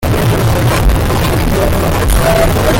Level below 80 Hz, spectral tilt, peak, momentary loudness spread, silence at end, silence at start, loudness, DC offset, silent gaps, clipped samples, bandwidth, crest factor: -16 dBFS; -5.5 dB/octave; -2 dBFS; 2 LU; 0 s; 0 s; -12 LUFS; under 0.1%; none; under 0.1%; 17 kHz; 8 dB